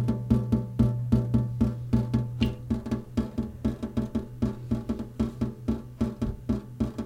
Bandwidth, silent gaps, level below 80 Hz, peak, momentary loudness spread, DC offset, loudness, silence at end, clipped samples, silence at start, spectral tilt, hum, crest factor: 10.5 kHz; none; -38 dBFS; -8 dBFS; 7 LU; under 0.1%; -29 LUFS; 0 s; under 0.1%; 0 s; -9 dB/octave; none; 20 dB